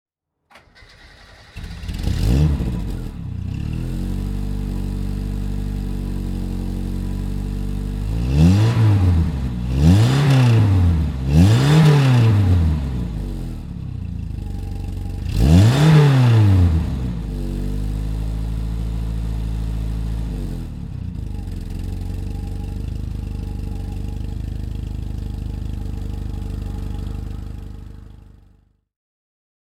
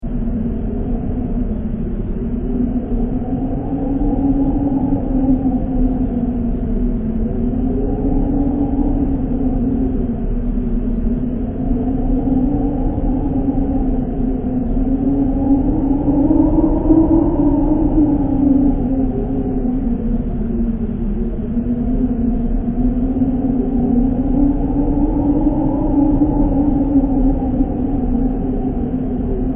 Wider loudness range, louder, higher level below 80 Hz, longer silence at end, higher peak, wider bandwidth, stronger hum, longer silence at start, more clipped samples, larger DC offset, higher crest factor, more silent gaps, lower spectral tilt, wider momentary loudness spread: first, 13 LU vs 5 LU; about the same, -20 LUFS vs -18 LUFS; about the same, -26 dBFS vs -22 dBFS; first, 1.6 s vs 0 s; about the same, -2 dBFS vs -2 dBFS; first, 14.5 kHz vs 3.1 kHz; neither; first, 0.55 s vs 0 s; neither; neither; about the same, 18 dB vs 14 dB; neither; second, -7.5 dB/octave vs -12 dB/octave; first, 16 LU vs 7 LU